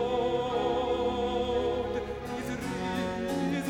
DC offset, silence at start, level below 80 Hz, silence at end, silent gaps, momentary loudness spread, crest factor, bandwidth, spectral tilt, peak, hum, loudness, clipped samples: under 0.1%; 0 s; -48 dBFS; 0 s; none; 6 LU; 14 dB; 16.5 kHz; -5.5 dB/octave; -16 dBFS; none; -31 LUFS; under 0.1%